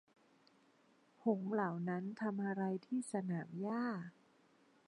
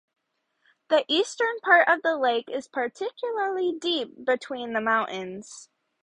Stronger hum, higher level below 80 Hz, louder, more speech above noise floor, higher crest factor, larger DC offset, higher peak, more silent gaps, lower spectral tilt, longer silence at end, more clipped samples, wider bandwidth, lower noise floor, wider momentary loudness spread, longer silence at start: neither; second, under -90 dBFS vs -76 dBFS; second, -41 LUFS vs -25 LUFS; second, 32 dB vs 47 dB; about the same, 20 dB vs 22 dB; neither; second, -22 dBFS vs -4 dBFS; neither; first, -7.5 dB/octave vs -2.5 dB/octave; first, 0.75 s vs 0.4 s; neither; about the same, 10 kHz vs 10.5 kHz; about the same, -71 dBFS vs -73 dBFS; second, 4 LU vs 13 LU; first, 1.25 s vs 0.9 s